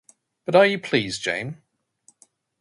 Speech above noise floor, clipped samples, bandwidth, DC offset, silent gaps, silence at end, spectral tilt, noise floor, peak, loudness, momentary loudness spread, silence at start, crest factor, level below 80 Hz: 40 dB; under 0.1%; 11.5 kHz; under 0.1%; none; 1.1 s; -4.5 dB/octave; -61 dBFS; -2 dBFS; -21 LUFS; 18 LU; 0.5 s; 22 dB; -64 dBFS